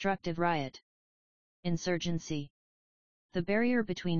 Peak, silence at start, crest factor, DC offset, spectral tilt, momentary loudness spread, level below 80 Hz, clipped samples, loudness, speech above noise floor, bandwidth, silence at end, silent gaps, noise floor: -14 dBFS; 0 s; 18 dB; 0.5%; -6 dB/octave; 11 LU; -60 dBFS; under 0.1%; -33 LUFS; over 58 dB; 7.2 kHz; 0 s; 0.83-1.63 s, 2.50-3.29 s; under -90 dBFS